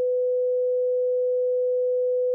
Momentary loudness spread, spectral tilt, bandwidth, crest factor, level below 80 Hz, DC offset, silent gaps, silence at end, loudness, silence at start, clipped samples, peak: 0 LU; -8 dB/octave; 0.6 kHz; 4 dB; under -90 dBFS; under 0.1%; none; 0 s; -24 LUFS; 0 s; under 0.1%; -20 dBFS